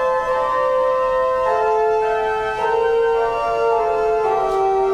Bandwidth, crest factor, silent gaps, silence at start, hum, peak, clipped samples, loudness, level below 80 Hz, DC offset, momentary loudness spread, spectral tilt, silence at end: 10.5 kHz; 10 dB; none; 0 s; none; -6 dBFS; under 0.1%; -18 LUFS; -44 dBFS; under 0.1%; 2 LU; -4.5 dB/octave; 0 s